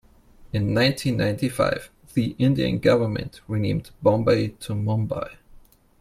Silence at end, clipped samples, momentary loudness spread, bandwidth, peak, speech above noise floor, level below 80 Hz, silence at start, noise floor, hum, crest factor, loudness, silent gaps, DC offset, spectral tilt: 0.4 s; under 0.1%; 10 LU; 15 kHz; -6 dBFS; 28 dB; -48 dBFS; 0.4 s; -50 dBFS; none; 18 dB; -23 LUFS; none; under 0.1%; -6.5 dB/octave